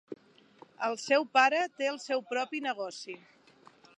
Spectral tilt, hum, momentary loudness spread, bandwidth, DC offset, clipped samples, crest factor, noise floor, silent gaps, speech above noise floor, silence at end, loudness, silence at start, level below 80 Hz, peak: -2 dB/octave; none; 21 LU; 11 kHz; under 0.1%; under 0.1%; 22 dB; -60 dBFS; none; 30 dB; 0.8 s; -30 LUFS; 0.1 s; under -90 dBFS; -12 dBFS